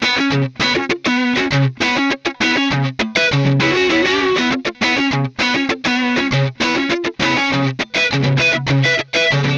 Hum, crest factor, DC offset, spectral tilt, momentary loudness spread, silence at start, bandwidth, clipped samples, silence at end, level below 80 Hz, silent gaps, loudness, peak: none; 14 dB; under 0.1%; -5 dB/octave; 3 LU; 0 s; 7.8 kHz; under 0.1%; 0 s; -46 dBFS; none; -16 LUFS; -4 dBFS